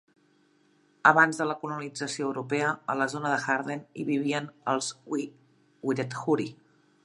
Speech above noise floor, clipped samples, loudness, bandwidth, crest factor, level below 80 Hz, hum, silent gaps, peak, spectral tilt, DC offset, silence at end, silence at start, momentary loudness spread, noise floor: 37 dB; under 0.1%; -28 LUFS; 11.5 kHz; 26 dB; -80 dBFS; none; none; -4 dBFS; -4.5 dB/octave; under 0.1%; 0.5 s; 1.05 s; 12 LU; -65 dBFS